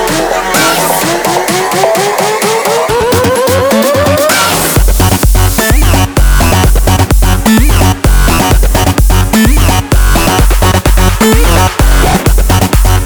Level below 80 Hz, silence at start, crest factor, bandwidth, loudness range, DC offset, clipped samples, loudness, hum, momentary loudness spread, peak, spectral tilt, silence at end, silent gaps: -10 dBFS; 0 s; 6 dB; over 20 kHz; 1 LU; under 0.1%; 0.5%; -8 LUFS; none; 2 LU; 0 dBFS; -4.5 dB/octave; 0 s; none